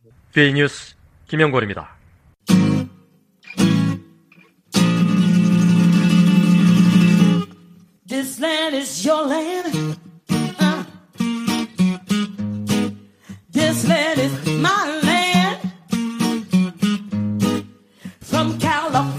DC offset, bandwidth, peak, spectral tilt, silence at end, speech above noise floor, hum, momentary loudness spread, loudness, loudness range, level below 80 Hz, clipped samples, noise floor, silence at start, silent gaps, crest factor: under 0.1%; 15.5 kHz; -2 dBFS; -5.5 dB/octave; 0 s; 34 dB; none; 13 LU; -18 LUFS; 7 LU; -54 dBFS; under 0.1%; -53 dBFS; 0.35 s; none; 18 dB